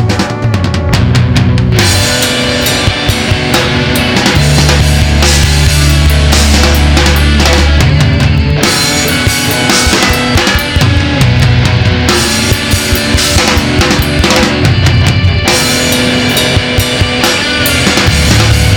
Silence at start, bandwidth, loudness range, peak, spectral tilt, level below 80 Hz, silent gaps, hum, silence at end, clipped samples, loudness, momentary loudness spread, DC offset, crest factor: 0 s; 19.5 kHz; 1 LU; 0 dBFS; -4 dB/octave; -16 dBFS; none; none; 0 s; 0.4%; -8 LUFS; 3 LU; under 0.1%; 8 dB